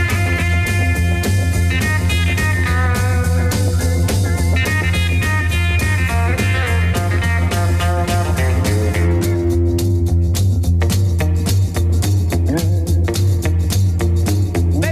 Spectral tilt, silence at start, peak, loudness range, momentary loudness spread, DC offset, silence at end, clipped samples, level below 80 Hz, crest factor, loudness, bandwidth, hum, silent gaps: -5.5 dB/octave; 0 s; -8 dBFS; 0 LU; 1 LU; under 0.1%; 0 s; under 0.1%; -28 dBFS; 8 dB; -16 LUFS; 15 kHz; none; none